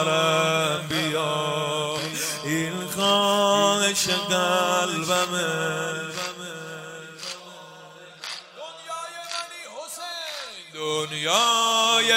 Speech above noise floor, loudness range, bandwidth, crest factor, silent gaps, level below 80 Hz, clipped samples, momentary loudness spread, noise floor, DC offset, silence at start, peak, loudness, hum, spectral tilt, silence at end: 22 dB; 14 LU; 16 kHz; 18 dB; none; -68 dBFS; under 0.1%; 17 LU; -45 dBFS; under 0.1%; 0 s; -6 dBFS; -23 LUFS; none; -2.5 dB/octave; 0 s